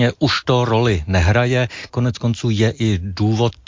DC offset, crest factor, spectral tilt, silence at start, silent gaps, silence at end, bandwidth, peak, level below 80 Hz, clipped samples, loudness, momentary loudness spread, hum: under 0.1%; 14 dB; -6.5 dB/octave; 0 s; none; 0.15 s; 7.6 kHz; -4 dBFS; -32 dBFS; under 0.1%; -18 LUFS; 5 LU; none